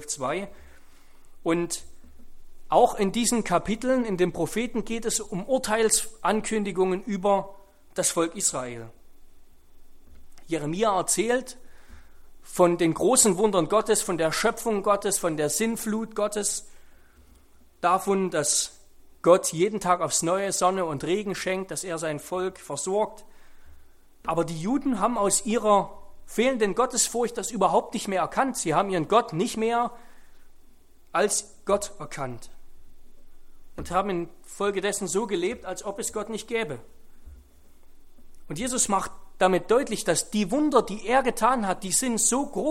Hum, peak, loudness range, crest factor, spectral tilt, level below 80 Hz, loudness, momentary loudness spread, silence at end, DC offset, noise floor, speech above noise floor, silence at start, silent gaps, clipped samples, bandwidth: none; -4 dBFS; 7 LU; 22 dB; -3.5 dB/octave; -50 dBFS; -25 LUFS; 11 LU; 0 s; under 0.1%; -54 dBFS; 29 dB; 0 s; none; under 0.1%; 16.5 kHz